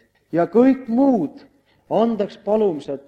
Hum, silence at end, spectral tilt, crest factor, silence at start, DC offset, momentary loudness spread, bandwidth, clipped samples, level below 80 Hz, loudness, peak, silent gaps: none; 0.05 s; -8.5 dB/octave; 16 dB; 0.35 s; under 0.1%; 9 LU; 6.8 kHz; under 0.1%; -62 dBFS; -19 LUFS; -4 dBFS; none